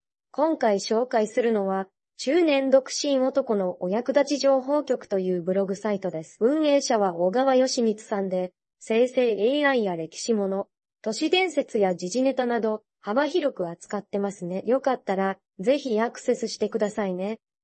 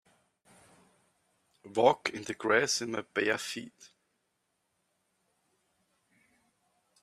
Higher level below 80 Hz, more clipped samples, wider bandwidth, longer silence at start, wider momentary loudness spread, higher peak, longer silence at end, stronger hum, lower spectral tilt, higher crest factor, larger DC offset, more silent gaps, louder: about the same, -78 dBFS vs -78 dBFS; neither; second, 8.8 kHz vs 14.5 kHz; second, 0.4 s vs 1.65 s; about the same, 10 LU vs 12 LU; first, -6 dBFS vs -10 dBFS; second, 0.25 s vs 3.15 s; neither; first, -4.5 dB/octave vs -2.5 dB/octave; second, 18 dB vs 26 dB; neither; neither; first, -25 LUFS vs -30 LUFS